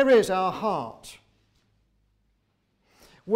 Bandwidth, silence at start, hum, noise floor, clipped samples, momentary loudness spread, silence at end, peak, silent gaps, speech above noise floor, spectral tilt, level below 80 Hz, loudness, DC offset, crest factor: 16 kHz; 0 s; none; -71 dBFS; under 0.1%; 26 LU; 0 s; -10 dBFS; none; 48 dB; -5 dB/octave; -64 dBFS; -24 LUFS; under 0.1%; 16 dB